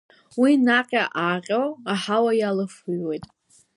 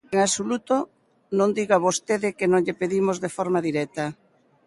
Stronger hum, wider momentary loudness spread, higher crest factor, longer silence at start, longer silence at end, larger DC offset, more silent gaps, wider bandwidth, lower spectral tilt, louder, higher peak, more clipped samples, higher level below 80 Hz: neither; first, 11 LU vs 8 LU; about the same, 18 dB vs 18 dB; first, 0.35 s vs 0.1 s; about the same, 0.5 s vs 0.55 s; neither; neither; about the same, 11.5 kHz vs 11.5 kHz; about the same, -5.5 dB/octave vs -4.5 dB/octave; about the same, -22 LUFS vs -24 LUFS; about the same, -6 dBFS vs -6 dBFS; neither; about the same, -68 dBFS vs -66 dBFS